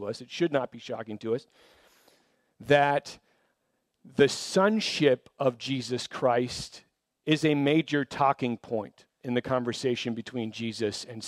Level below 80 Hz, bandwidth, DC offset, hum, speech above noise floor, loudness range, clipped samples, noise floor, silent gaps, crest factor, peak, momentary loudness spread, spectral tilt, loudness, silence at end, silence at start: -66 dBFS; 14 kHz; under 0.1%; none; 49 dB; 4 LU; under 0.1%; -77 dBFS; none; 22 dB; -8 dBFS; 13 LU; -5 dB/octave; -28 LUFS; 0 s; 0 s